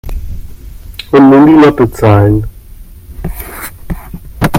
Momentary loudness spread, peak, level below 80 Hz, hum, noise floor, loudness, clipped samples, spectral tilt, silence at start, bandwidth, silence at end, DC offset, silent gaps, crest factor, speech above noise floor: 24 LU; 0 dBFS; -24 dBFS; none; -31 dBFS; -7 LUFS; 0.2%; -7.5 dB/octave; 0.05 s; 17 kHz; 0 s; under 0.1%; none; 10 dB; 26 dB